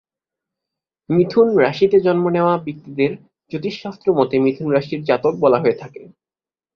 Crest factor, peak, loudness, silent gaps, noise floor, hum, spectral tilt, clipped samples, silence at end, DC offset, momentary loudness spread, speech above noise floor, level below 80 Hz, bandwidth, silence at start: 16 dB; -2 dBFS; -17 LUFS; none; under -90 dBFS; none; -8.5 dB/octave; under 0.1%; 0.7 s; under 0.1%; 12 LU; over 73 dB; -58 dBFS; 6.6 kHz; 1.1 s